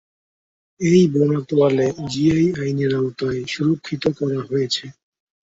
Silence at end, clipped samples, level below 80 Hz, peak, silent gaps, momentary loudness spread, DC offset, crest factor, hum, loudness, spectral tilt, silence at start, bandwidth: 0.5 s; under 0.1%; -54 dBFS; -4 dBFS; none; 8 LU; under 0.1%; 16 dB; none; -20 LUFS; -6.5 dB/octave; 0.8 s; 8 kHz